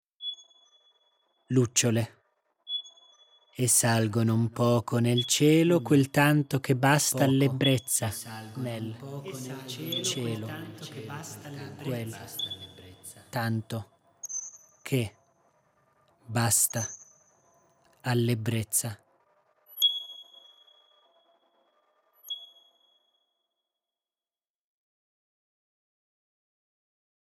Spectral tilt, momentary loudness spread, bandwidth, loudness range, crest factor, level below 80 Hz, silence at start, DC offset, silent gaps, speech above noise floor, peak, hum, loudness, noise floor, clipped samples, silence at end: -4 dB/octave; 18 LU; 18 kHz; 22 LU; 22 dB; -72 dBFS; 0.2 s; under 0.1%; none; over 63 dB; -8 dBFS; none; -27 LUFS; under -90 dBFS; under 0.1%; 4.9 s